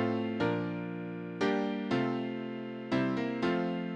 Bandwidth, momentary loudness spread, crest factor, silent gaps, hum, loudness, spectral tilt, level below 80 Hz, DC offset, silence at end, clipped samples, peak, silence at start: 8.8 kHz; 8 LU; 16 dB; none; none; -33 LUFS; -7.5 dB/octave; -68 dBFS; under 0.1%; 0 s; under 0.1%; -16 dBFS; 0 s